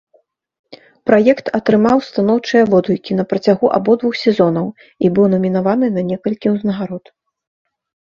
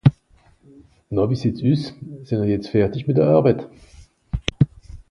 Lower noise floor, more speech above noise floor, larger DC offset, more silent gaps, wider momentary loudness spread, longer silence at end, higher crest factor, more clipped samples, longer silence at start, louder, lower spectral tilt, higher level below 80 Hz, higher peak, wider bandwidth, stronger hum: about the same, -58 dBFS vs -56 dBFS; first, 43 dB vs 36 dB; neither; neither; second, 8 LU vs 13 LU; first, 1.15 s vs 0.1 s; about the same, 16 dB vs 20 dB; neither; first, 0.7 s vs 0.05 s; first, -15 LUFS vs -21 LUFS; about the same, -8 dB/octave vs -8.5 dB/octave; second, -56 dBFS vs -40 dBFS; about the same, 0 dBFS vs 0 dBFS; second, 7.2 kHz vs 9.8 kHz; neither